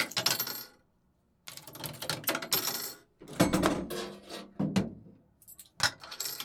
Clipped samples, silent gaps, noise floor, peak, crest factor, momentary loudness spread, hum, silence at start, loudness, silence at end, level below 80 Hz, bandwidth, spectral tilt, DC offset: under 0.1%; none; -71 dBFS; -8 dBFS; 26 dB; 21 LU; none; 0 s; -32 LUFS; 0 s; -58 dBFS; over 20 kHz; -3 dB/octave; under 0.1%